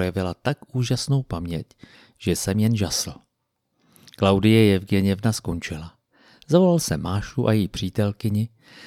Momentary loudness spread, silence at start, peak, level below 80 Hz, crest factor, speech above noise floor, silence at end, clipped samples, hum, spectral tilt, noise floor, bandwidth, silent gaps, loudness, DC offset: 14 LU; 0 s; -4 dBFS; -46 dBFS; 18 dB; 54 dB; 0 s; under 0.1%; none; -6 dB/octave; -76 dBFS; 16 kHz; none; -23 LUFS; under 0.1%